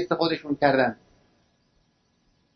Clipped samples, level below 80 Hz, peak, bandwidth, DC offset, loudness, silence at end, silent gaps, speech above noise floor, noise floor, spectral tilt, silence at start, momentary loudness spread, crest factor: under 0.1%; -62 dBFS; -4 dBFS; 6.4 kHz; under 0.1%; -24 LUFS; 1.6 s; none; 44 dB; -68 dBFS; -7 dB/octave; 0 s; 8 LU; 22 dB